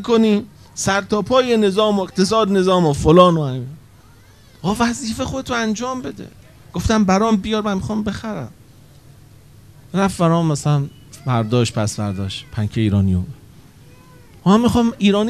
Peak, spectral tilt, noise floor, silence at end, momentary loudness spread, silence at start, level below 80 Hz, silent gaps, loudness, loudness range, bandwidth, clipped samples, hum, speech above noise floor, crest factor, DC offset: 0 dBFS; -6 dB/octave; -47 dBFS; 0 s; 14 LU; 0 s; -42 dBFS; none; -18 LUFS; 6 LU; 14 kHz; under 0.1%; none; 30 dB; 18 dB; 0.2%